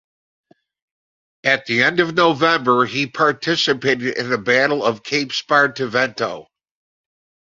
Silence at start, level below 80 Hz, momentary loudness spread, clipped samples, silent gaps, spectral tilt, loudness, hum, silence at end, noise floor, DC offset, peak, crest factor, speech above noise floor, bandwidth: 1.45 s; -62 dBFS; 6 LU; under 0.1%; none; -4 dB/octave; -17 LUFS; none; 1.05 s; under -90 dBFS; under 0.1%; 0 dBFS; 18 dB; over 72 dB; 7.8 kHz